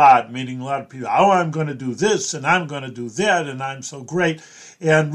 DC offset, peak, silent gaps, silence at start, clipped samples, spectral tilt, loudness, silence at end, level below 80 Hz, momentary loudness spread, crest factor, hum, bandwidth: under 0.1%; -2 dBFS; none; 0 s; under 0.1%; -4.5 dB/octave; -20 LUFS; 0 s; -64 dBFS; 13 LU; 18 dB; none; 11.5 kHz